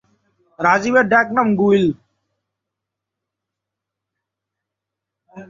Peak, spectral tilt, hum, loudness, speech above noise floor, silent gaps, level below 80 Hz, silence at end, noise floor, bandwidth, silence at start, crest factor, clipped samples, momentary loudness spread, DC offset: -2 dBFS; -6.5 dB/octave; none; -16 LUFS; 68 dB; none; -60 dBFS; 0.05 s; -83 dBFS; 7.4 kHz; 0.6 s; 20 dB; under 0.1%; 7 LU; under 0.1%